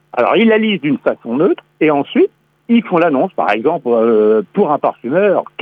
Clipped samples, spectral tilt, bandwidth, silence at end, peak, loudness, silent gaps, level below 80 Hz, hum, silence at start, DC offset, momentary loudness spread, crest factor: under 0.1%; -8.5 dB/octave; 5 kHz; 0.15 s; -2 dBFS; -14 LUFS; none; -66 dBFS; none; 0.15 s; under 0.1%; 5 LU; 12 dB